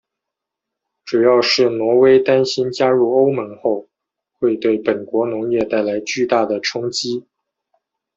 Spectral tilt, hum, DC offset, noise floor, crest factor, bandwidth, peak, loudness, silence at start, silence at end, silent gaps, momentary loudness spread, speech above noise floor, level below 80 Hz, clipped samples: -4.5 dB/octave; none; under 0.1%; -82 dBFS; 16 dB; 7.8 kHz; -2 dBFS; -17 LUFS; 1.05 s; 0.95 s; none; 9 LU; 66 dB; -62 dBFS; under 0.1%